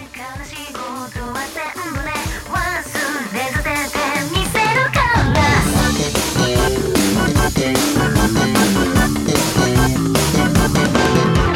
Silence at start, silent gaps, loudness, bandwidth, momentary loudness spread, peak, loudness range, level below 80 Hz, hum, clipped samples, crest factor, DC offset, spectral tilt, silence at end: 0 s; none; -16 LUFS; 17 kHz; 10 LU; 0 dBFS; 7 LU; -28 dBFS; none; under 0.1%; 16 dB; under 0.1%; -4.5 dB/octave; 0 s